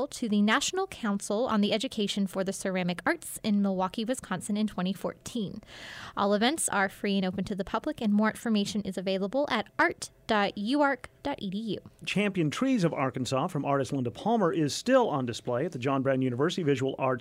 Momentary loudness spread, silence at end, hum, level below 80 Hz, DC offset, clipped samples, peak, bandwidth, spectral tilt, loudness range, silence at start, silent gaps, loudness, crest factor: 9 LU; 0 s; none; -62 dBFS; under 0.1%; under 0.1%; -12 dBFS; 16 kHz; -5 dB/octave; 3 LU; 0 s; none; -29 LUFS; 16 dB